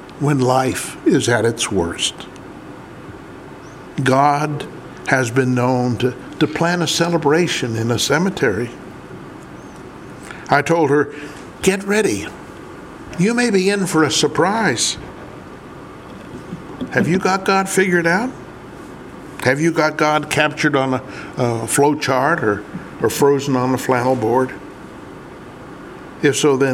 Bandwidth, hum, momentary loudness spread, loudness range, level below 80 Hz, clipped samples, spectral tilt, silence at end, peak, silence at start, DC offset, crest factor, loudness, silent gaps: 17 kHz; none; 20 LU; 3 LU; -50 dBFS; under 0.1%; -4.5 dB/octave; 0 s; 0 dBFS; 0 s; under 0.1%; 18 dB; -17 LUFS; none